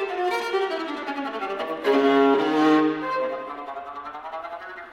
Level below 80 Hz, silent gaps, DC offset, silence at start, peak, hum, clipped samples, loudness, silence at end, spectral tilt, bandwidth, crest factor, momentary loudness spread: -66 dBFS; none; under 0.1%; 0 s; -6 dBFS; none; under 0.1%; -23 LUFS; 0 s; -5 dB/octave; 13.5 kHz; 16 dB; 16 LU